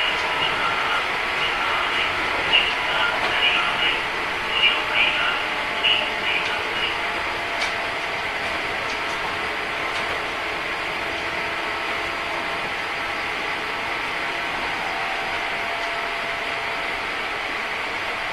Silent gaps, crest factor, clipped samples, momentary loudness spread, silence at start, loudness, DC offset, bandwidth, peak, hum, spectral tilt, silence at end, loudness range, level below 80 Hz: none; 20 dB; under 0.1%; 7 LU; 0 s; -22 LUFS; under 0.1%; 14 kHz; -4 dBFS; none; -2 dB/octave; 0 s; 5 LU; -48 dBFS